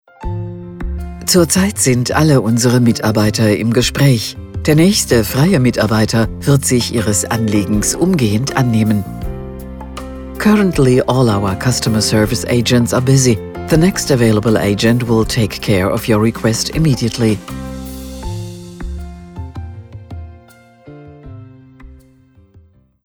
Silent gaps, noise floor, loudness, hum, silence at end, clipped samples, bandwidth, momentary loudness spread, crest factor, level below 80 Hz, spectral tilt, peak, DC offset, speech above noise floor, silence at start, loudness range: none; -47 dBFS; -13 LUFS; none; 1.15 s; under 0.1%; 19 kHz; 17 LU; 14 dB; -32 dBFS; -5 dB/octave; 0 dBFS; under 0.1%; 35 dB; 0.2 s; 16 LU